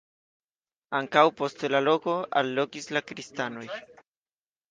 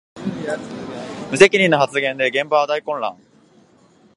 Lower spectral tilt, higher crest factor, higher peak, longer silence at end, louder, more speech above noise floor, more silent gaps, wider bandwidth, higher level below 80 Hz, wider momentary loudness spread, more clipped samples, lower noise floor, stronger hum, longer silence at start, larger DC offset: about the same, -4.5 dB/octave vs -4 dB/octave; about the same, 24 dB vs 20 dB; second, -6 dBFS vs 0 dBFS; second, 0.9 s vs 1.05 s; second, -26 LUFS vs -18 LUFS; first, over 63 dB vs 36 dB; neither; second, 9.6 kHz vs 11.5 kHz; second, -78 dBFS vs -60 dBFS; about the same, 16 LU vs 18 LU; neither; first, under -90 dBFS vs -53 dBFS; neither; first, 0.9 s vs 0.15 s; neither